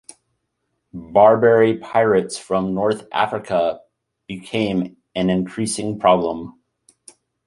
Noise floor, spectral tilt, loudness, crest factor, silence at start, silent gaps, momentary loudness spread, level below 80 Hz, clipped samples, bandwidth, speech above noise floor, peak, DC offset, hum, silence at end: -74 dBFS; -5.5 dB/octave; -19 LUFS; 18 dB; 0.95 s; none; 19 LU; -54 dBFS; under 0.1%; 11.5 kHz; 56 dB; -2 dBFS; under 0.1%; none; 0.95 s